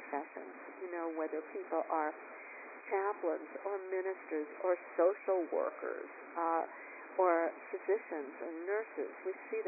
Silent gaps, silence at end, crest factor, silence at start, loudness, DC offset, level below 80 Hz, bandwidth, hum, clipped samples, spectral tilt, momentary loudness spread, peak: none; 0 s; 18 dB; 0 s; -38 LUFS; under 0.1%; under -90 dBFS; 2.7 kHz; none; under 0.1%; -4.5 dB/octave; 14 LU; -18 dBFS